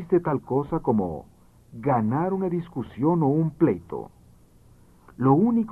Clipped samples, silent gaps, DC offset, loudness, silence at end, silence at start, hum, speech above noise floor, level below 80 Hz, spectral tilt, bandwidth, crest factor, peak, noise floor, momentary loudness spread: under 0.1%; none; under 0.1%; -24 LUFS; 0 s; 0 s; none; 30 dB; -54 dBFS; -11 dB/octave; 4 kHz; 18 dB; -8 dBFS; -54 dBFS; 14 LU